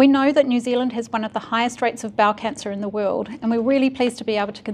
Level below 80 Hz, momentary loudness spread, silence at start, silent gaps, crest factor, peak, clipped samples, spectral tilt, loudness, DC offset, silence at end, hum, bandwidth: -62 dBFS; 8 LU; 0 s; none; 18 dB; -2 dBFS; under 0.1%; -5 dB/octave; -21 LUFS; under 0.1%; 0 s; none; 11.5 kHz